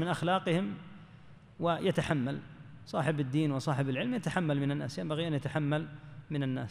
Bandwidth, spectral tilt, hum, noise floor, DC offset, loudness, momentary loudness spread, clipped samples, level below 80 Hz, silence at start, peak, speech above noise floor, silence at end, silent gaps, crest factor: 12 kHz; -7 dB/octave; none; -54 dBFS; under 0.1%; -33 LUFS; 12 LU; under 0.1%; -64 dBFS; 0 s; -16 dBFS; 22 dB; 0 s; none; 18 dB